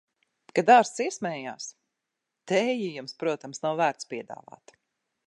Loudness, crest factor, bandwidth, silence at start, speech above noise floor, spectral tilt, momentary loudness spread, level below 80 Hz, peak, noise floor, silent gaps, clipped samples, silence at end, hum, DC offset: -26 LUFS; 22 dB; 11 kHz; 0.55 s; 58 dB; -4 dB/octave; 19 LU; -84 dBFS; -6 dBFS; -84 dBFS; none; under 0.1%; 0.95 s; none; under 0.1%